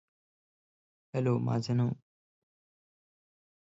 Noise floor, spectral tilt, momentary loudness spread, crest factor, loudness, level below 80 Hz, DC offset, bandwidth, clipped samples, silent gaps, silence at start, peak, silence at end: under -90 dBFS; -8 dB/octave; 9 LU; 18 dB; -32 LUFS; -72 dBFS; under 0.1%; 7.8 kHz; under 0.1%; none; 1.15 s; -16 dBFS; 1.7 s